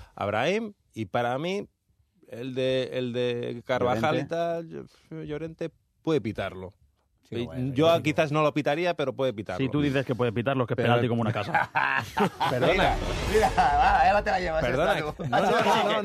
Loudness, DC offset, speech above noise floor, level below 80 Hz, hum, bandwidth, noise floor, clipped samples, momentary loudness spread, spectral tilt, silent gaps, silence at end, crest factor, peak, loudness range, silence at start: -26 LUFS; under 0.1%; 42 dB; -44 dBFS; none; 14 kHz; -68 dBFS; under 0.1%; 14 LU; -6 dB/octave; none; 0 s; 16 dB; -10 dBFS; 7 LU; 0 s